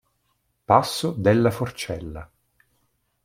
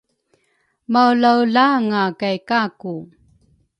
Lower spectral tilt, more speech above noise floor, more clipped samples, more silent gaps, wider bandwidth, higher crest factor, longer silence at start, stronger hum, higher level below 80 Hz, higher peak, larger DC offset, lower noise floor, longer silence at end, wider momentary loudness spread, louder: about the same, -6 dB/octave vs -6.5 dB/octave; about the same, 49 dB vs 49 dB; neither; neither; first, 16.5 kHz vs 8.6 kHz; about the same, 22 dB vs 18 dB; second, 0.7 s vs 0.9 s; neither; first, -52 dBFS vs -66 dBFS; about the same, -2 dBFS vs -2 dBFS; neither; first, -71 dBFS vs -66 dBFS; first, 1 s vs 0.75 s; about the same, 15 LU vs 15 LU; second, -22 LUFS vs -17 LUFS